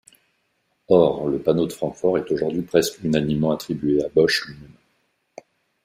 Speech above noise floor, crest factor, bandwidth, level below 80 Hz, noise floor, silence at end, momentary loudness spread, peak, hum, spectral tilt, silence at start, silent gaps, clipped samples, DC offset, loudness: 49 dB; 20 dB; 15.5 kHz; -54 dBFS; -70 dBFS; 1.2 s; 6 LU; -2 dBFS; none; -5.5 dB/octave; 0.9 s; none; under 0.1%; under 0.1%; -21 LUFS